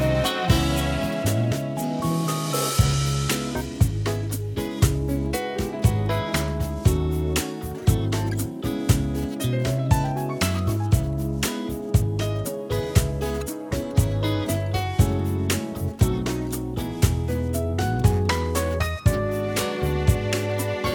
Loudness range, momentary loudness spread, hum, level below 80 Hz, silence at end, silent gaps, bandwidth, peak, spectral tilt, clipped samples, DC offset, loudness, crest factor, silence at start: 1 LU; 6 LU; none; -32 dBFS; 0 s; none; 20 kHz; -4 dBFS; -5.5 dB/octave; under 0.1%; under 0.1%; -24 LUFS; 18 dB; 0 s